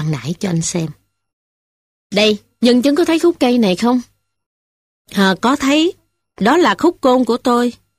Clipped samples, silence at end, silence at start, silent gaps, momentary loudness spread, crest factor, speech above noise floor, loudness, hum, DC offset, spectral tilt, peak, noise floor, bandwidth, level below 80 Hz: under 0.1%; 0.25 s; 0 s; 1.33-2.10 s, 4.46-5.05 s; 8 LU; 16 dB; over 76 dB; -15 LUFS; none; under 0.1%; -5 dB/octave; 0 dBFS; under -90 dBFS; 15 kHz; -52 dBFS